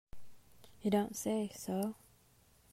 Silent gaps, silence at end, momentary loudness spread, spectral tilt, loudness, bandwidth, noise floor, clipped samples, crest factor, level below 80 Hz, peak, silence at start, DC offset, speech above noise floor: none; 0.75 s; 7 LU; -5.5 dB/octave; -37 LUFS; 16 kHz; -67 dBFS; under 0.1%; 18 dB; -66 dBFS; -20 dBFS; 0.15 s; under 0.1%; 32 dB